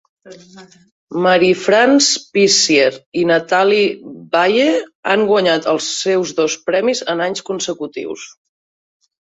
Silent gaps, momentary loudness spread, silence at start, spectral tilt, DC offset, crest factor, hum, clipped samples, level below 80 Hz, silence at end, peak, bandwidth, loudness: 0.91-1.07 s, 3.06-3.12 s, 4.95-5.03 s; 11 LU; 0.25 s; -3 dB/octave; under 0.1%; 14 dB; none; under 0.1%; -62 dBFS; 1 s; -2 dBFS; 8 kHz; -15 LUFS